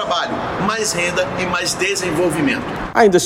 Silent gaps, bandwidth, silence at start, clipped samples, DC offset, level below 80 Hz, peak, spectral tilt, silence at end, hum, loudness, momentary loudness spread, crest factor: none; 16.5 kHz; 0 s; under 0.1%; under 0.1%; -42 dBFS; 0 dBFS; -3.5 dB/octave; 0 s; none; -18 LUFS; 5 LU; 18 dB